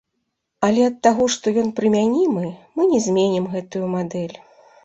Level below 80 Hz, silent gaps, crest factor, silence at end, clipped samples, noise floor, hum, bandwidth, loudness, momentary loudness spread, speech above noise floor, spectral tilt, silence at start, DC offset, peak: -60 dBFS; none; 18 dB; 0.5 s; under 0.1%; -75 dBFS; none; 8.2 kHz; -20 LUFS; 9 LU; 56 dB; -5.5 dB/octave; 0.6 s; under 0.1%; -2 dBFS